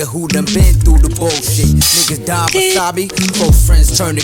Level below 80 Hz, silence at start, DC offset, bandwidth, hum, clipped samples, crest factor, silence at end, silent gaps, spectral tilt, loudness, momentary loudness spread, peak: -14 dBFS; 0 s; under 0.1%; 18 kHz; none; under 0.1%; 10 dB; 0 s; none; -4 dB/octave; -11 LUFS; 6 LU; 0 dBFS